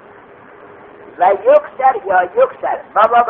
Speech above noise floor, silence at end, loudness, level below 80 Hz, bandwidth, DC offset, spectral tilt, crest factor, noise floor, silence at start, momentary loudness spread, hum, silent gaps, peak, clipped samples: 27 dB; 0 s; -14 LUFS; -60 dBFS; 4.1 kHz; under 0.1%; -1.5 dB/octave; 14 dB; -40 dBFS; 1.2 s; 5 LU; none; none; 0 dBFS; under 0.1%